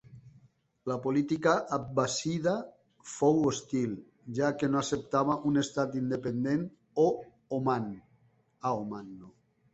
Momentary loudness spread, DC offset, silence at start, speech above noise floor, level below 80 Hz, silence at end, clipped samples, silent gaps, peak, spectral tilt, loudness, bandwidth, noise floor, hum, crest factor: 14 LU; under 0.1%; 0.1 s; 37 dB; -66 dBFS; 0.45 s; under 0.1%; none; -12 dBFS; -5.5 dB/octave; -31 LUFS; 8.2 kHz; -67 dBFS; none; 20 dB